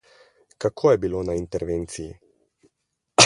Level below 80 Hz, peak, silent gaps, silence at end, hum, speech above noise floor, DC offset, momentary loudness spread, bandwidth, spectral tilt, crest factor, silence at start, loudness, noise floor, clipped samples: -46 dBFS; 0 dBFS; none; 0 s; none; 53 dB; under 0.1%; 14 LU; 11.5 kHz; -3 dB/octave; 24 dB; 0.6 s; -25 LUFS; -76 dBFS; under 0.1%